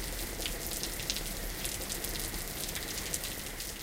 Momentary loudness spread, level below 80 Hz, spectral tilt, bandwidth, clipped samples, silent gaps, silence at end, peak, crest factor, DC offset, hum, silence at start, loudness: 3 LU; -44 dBFS; -2 dB/octave; 16.5 kHz; under 0.1%; none; 0 s; -10 dBFS; 26 dB; under 0.1%; none; 0 s; -35 LUFS